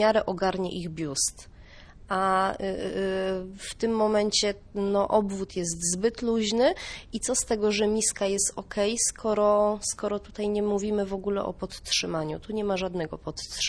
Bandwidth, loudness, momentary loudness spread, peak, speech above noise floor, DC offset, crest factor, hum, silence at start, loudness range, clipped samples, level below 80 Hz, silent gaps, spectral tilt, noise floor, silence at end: 11 kHz; -27 LUFS; 8 LU; -10 dBFS; 21 dB; under 0.1%; 18 dB; none; 0 s; 4 LU; under 0.1%; -50 dBFS; none; -3 dB/octave; -48 dBFS; 0 s